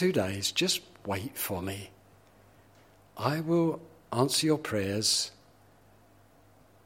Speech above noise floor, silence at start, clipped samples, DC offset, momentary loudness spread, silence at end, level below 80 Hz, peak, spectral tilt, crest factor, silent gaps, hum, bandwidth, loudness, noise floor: 31 dB; 0 s; under 0.1%; under 0.1%; 12 LU; 1.55 s; -66 dBFS; -10 dBFS; -4 dB/octave; 22 dB; none; none; 16.5 kHz; -29 LUFS; -60 dBFS